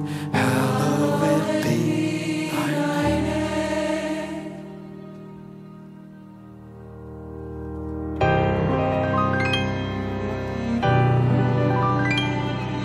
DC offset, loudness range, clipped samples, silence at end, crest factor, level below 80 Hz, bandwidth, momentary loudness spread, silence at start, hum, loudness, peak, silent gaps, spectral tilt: under 0.1%; 14 LU; under 0.1%; 0 s; 14 dB; -42 dBFS; 15 kHz; 21 LU; 0 s; none; -23 LUFS; -8 dBFS; none; -6.5 dB/octave